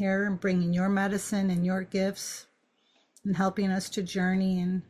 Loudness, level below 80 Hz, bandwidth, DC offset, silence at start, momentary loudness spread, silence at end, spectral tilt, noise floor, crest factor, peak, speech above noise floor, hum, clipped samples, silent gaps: -28 LUFS; -62 dBFS; 13.5 kHz; under 0.1%; 0 s; 7 LU; 0.1 s; -6 dB/octave; -69 dBFS; 14 dB; -14 dBFS; 41 dB; none; under 0.1%; none